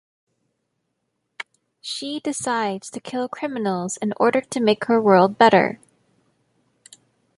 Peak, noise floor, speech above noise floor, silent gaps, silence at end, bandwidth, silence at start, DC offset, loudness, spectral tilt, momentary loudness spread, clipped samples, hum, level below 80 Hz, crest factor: -2 dBFS; -75 dBFS; 55 dB; none; 1.65 s; 11.5 kHz; 1.4 s; under 0.1%; -20 LUFS; -4.5 dB/octave; 22 LU; under 0.1%; none; -68 dBFS; 22 dB